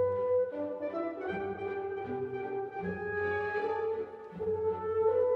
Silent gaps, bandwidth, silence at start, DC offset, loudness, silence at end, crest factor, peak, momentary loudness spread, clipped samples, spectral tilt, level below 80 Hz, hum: none; 5.4 kHz; 0 s; under 0.1%; -34 LUFS; 0 s; 14 dB; -20 dBFS; 7 LU; under 0.1%; -8.5 dB/octave; -66 dBFS; none